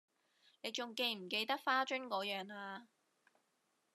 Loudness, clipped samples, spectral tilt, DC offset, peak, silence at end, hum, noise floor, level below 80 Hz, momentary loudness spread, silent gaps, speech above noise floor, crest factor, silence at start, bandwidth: -39 LUFS; under 0.1%; -2.5 dB/octave; under 0.1%; -20 dBFS; 1.1 s; none; -82 dBFS; under -90 dBFS; 13 LU; none; 41 dB; 22 dB; 0.65 s; 13.5 kHz